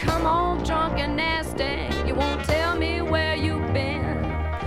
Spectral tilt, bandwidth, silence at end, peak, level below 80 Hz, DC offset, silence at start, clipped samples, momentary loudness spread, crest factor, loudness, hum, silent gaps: -6 dB/octave; 15 kHz; 0 s; -8 dBFS; -32 dBFS; under 0.1%; 0 s; under 0.1%; 4 LU; 16 dB; -24 LUFS; none; none